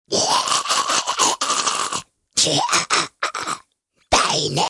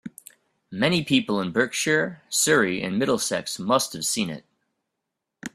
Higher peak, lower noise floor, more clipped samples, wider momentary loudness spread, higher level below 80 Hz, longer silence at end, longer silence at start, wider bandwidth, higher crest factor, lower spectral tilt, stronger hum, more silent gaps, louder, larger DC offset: about the same, -4 dBFS vs -4 dBFS; second, -64 dBFS vs -82 dBFS; neither; about the same, 9 LU vs 11 LU; first, -50 dBFS vs -64 dBFS; about the same, 0 s vs 0.05 s; about the same, 0.1 s vs 0.05 s; second, 12 kHz vs 15.5 kHz; second, 16 dB vs 22 dB; second, -1 dB/octave vs -3 dB/octave; neither; neither; first, -19 LUFS vs -23 LUFS; neither